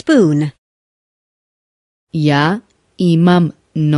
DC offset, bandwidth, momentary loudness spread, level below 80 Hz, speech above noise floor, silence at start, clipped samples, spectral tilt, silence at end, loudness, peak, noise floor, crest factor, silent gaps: under 0.1%; 11.5 kHz; 12 LU; -56 dBFS; over 78 dB; 0.05 s; under 0.1%; -7.5 dB/octave; 0 s; -14 LUFS; 0 dBFS; under -90 dBFS; 16 dB; 0.59-2.07 s